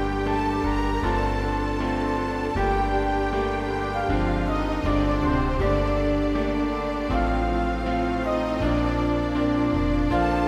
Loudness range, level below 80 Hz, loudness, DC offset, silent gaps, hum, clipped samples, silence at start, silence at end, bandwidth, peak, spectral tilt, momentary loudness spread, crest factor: 1 LU; -30 dBFS; -24 LUFS; under 0.1%; none; none; under 0.1%; 0 s; 0 s; 10.5 kHz; -10 dBFS; -7.5 dB/octave; 3 LU; 12 dB